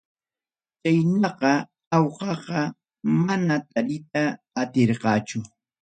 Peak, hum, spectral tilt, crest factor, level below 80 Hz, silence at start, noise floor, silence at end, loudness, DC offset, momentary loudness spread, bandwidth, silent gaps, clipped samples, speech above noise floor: -6 dBFS; none; -6.5 dB/octave; 18 dB; -66 dBFS; 0.85 s; under -90 dBFS; 0.35 s; -24 LUFS; under 0.1%; 9 LU; 9.2 kHz; 1.87-1.91 s; under 0.1%; over 67 dB